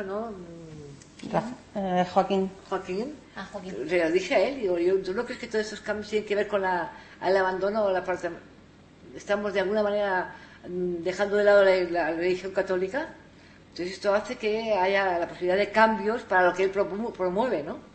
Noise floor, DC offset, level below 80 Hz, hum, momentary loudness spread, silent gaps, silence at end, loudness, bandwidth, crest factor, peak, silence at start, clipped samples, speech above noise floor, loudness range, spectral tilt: -52 dBFS; under 0.1%; -58 dBFS; none; 16 LU; none; 0.1 s; -26 LUFS; 8.8 kHz; 22 dB; -4 dBFS; 0 s; under 0.1%; 26 dB; 5 LU; -5.5 dB/octave